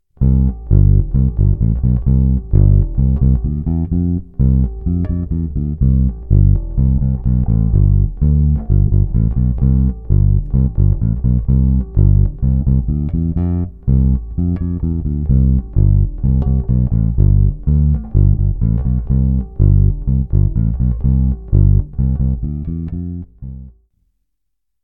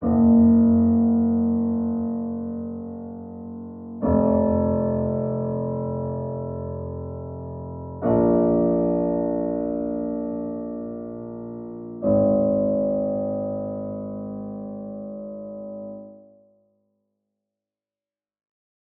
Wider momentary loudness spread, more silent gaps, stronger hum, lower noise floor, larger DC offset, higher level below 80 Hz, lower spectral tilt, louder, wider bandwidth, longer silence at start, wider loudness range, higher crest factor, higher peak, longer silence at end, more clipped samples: second, 6 LU vs 17 LU; neither; neither; second, -77 dBFS vs under -90 dBFS; neither; first, -16 dBFS vs -48 dBFS; about the same, -15 dB/octave vs -15 dB/octave; first, -16 LUFS vs -23 LUFS; second, 1.8 kHz vs 2 kHz; first, 0.2 s vs 0 s; second, 2 LU vs 13 LU; about the same, 12 dB vs 16 dB; first, -2 dBFS vs -8 dBFS; second, 1.15 s vs 2.8 s; neither